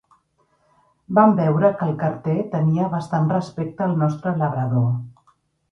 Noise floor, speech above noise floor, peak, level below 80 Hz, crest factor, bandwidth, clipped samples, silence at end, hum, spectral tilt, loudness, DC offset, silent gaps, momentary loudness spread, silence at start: -64 dBFS; 45 dB; -2 dBFS; -60 dBFS; 18 dB; 7 kHz; under 0.1%; 0.6 s; none; -9.5 dB/octave; -21 LUFS; under 0.1%; none; 8 LU; 1.1 s